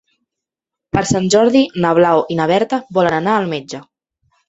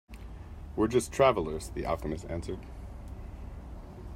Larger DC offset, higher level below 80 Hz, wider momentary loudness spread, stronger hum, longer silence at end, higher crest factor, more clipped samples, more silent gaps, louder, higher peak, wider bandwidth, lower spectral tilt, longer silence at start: neither; second, -50 dBFS vs -44 dBFS; second, 10 LU vs 21 LU; neither; first, 0.65 s vs 0 s; second, 16 dB vs 22 dB; neither; neither; first, -15 LUFS vs -30 LUFS; first, 0 dBFS vs -10 dBFS; second, 8.2 kHz vs 16 kHz; about the same, -5 dB/octave vs -5.5 dB/octave; first, 0.95 s vs 0.1 s